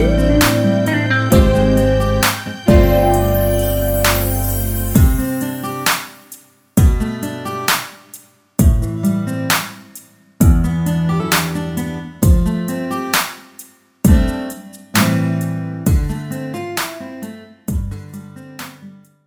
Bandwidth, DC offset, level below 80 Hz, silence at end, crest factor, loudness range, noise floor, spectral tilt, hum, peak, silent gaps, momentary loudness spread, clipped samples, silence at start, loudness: over 20 kHz; under 0.1%; -22 dBFS; 0.35 s; 16 dB; 6 LU; -42 dBFS; -5.5 dB/octave; none; 0 dBFS; none; 17 LU; under 0.1%; 0 s; -16 LUFS